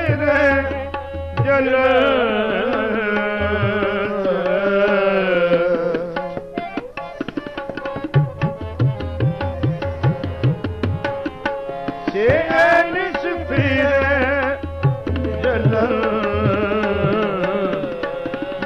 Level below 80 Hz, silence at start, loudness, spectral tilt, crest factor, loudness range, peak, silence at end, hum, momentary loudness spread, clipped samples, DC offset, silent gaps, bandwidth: -38 dBFS; 0 s; -19 LUFS; -8 dB/octave; 16 dB; 5 LU; -4 dBFS; 0 s; none; 12 LU; under 0.1%; under 0.1%; none; 7.6 kHz